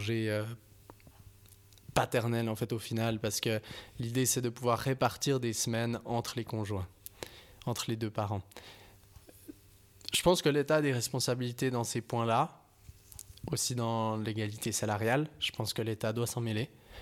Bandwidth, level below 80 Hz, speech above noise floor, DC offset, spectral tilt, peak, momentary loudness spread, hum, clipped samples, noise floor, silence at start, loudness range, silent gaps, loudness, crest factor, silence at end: 18 kHz; -60 dBFS; 27 dB; under 0.1%; -4.5 dB/octave; -10 dBFS; 17 LU; none; under 0.1%; -59 dBFS; 0 s; 6 LU; none; -33 LUFS; 24 dB; 0 s